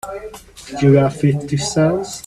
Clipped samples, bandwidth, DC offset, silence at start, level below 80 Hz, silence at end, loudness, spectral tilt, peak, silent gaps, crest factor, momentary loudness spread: under 0.1%; 13.5 kHz; under 0.1%; 0.05 s; -46 dBFS; 0.05 s; -16 LUFS; -6.5 dB/octave; 0 dBFS; none; 16 dB; 19 LU